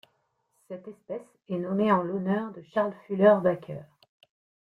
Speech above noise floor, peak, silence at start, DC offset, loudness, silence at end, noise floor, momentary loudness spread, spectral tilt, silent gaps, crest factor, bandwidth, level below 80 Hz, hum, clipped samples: 47 dB; -8 dBFS; 0.7 s; under 0.1%; -26 LUFS; 0.85 s; -73 dBFS; 21 LU; -9 dB/octave; none; 20 dB; 4.9 kHz; -72 dBFS; none; under 0.1%